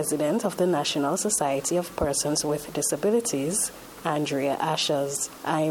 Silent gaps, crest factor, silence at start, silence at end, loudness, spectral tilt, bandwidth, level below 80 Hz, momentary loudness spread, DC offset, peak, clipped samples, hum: none; 16 dB; 0 s; 0 s; -25 LUFS; -3.5 dB/octave; 17.5 kHz; -52 dBFS; 4 LU; under 0.1%; -10 dBFS; under 0.1%; none